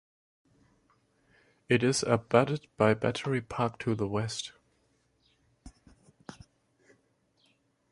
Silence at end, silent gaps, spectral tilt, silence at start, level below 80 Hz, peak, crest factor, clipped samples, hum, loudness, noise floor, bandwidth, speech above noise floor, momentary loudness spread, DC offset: 1.6 s; none; -5.5 dB/octave; 1.7 s; -62 dBFS; -8 dBFS; 26 dB; under 0.1%; none; -29 LUFS; -71 dBFS; 11.5 kHz; 43 dB; 22 LU; under 0.1%